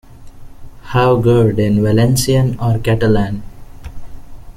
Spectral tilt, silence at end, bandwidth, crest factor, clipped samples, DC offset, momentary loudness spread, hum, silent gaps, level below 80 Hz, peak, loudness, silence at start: -6.5 dB/octave; 0.05 s; 15.5 kHz; 14 dB; under 0.1%; under 0.1%; 8 LU; none; none; -32 dBFS; -2 dBFS; -14 LUFS; 0.1 s